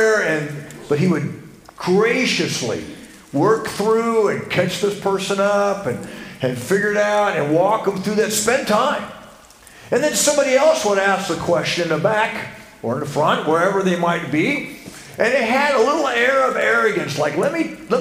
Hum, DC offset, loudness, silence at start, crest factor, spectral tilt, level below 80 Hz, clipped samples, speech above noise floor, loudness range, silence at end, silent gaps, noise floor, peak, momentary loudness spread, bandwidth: none; under 0.1%; -18 LUFS; 0 s; 16 dB; -4 dB/octave; -54 dBFS; under 0.1%; 26 dB; 2 LU; 0 s; none; -44 dBFS; -2 dBFS; 11 LU; 16 kHz